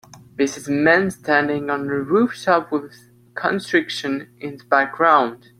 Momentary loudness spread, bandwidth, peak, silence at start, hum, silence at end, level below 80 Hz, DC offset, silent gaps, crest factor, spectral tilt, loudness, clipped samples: 12 LU; 15 kHz; -2 dBFS; 0.15 s; none; 0.25 s; -62 dBFS; under 0.1%; none; 18 dB; -5 dB/octave; -19 LUFS; under 0.1%